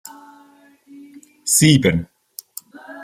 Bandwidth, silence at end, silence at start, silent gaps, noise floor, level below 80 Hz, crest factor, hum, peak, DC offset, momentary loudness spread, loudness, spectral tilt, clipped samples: 16 kHz; 0 s; 1.45 s; none; -51 dBFS; -52 dBFS; 20 dB; none; -2 dBFS; under 0.1%; 26 LU; -15 LUFS; -4 dB/octave; under 0.1%